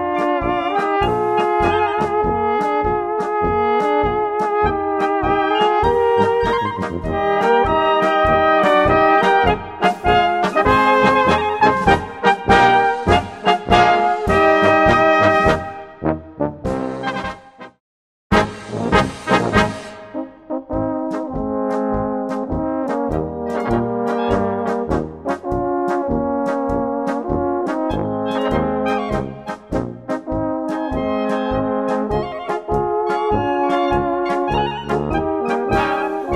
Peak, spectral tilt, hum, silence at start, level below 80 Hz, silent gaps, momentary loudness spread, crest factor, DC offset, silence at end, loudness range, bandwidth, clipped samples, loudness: 0 dBFS; -6 dB/octave; none; 0 s; -36 dBFS; 17.80-18.30 s; 11 LU; 18 dB; 0.1%; 0 s; 7 LU; 12.5 kHz; under 0.1%; -18 LUFS